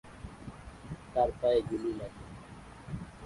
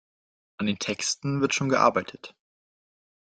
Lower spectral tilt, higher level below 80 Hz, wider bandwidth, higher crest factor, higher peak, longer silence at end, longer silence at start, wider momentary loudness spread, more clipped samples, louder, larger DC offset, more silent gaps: first, -7 dB/octave vs -4 dB/octave; first, -52 dBFS vs -68 dBFS; first, 11.5 kHz vs 9.6 kHz; about the same, 20 dB vs 22 dB; second, -16 dBFS vs -6 dBFS; second, 0 s vs 0.95 s; second, 0.05 s vs 0.6 s; about the same, 20 LU vs 19 LU; neither; second, -33 LUFS vs -25 LUFS; neither; neither